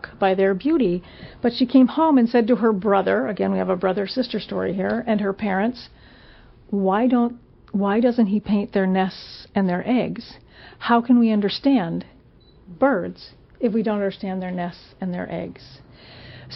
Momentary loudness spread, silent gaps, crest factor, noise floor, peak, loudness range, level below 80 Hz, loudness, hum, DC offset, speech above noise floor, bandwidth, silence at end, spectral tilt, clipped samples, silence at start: 13 LU; none; 18 dB; -51 dBFS; -4 dBFS; 6 LU; -54 dBFS; -21 LUFS; none; under 0.1%; 30 dB; 6 kHz; 0 s; -5.5 dB/octave; under 0.1%; 0.05 s